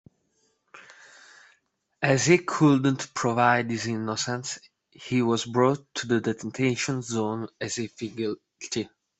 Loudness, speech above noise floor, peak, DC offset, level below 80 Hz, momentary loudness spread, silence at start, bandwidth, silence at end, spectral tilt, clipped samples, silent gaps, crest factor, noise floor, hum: -26 LUFS; 45 dB; -6 dBFS; under 0.1%; -66 dBFS; 12 LU; 0.75 s; 8.4 kHz; 0.35 s; -5 dB/octave; under 0.1%; none; 20 dB; -71 dBFS; none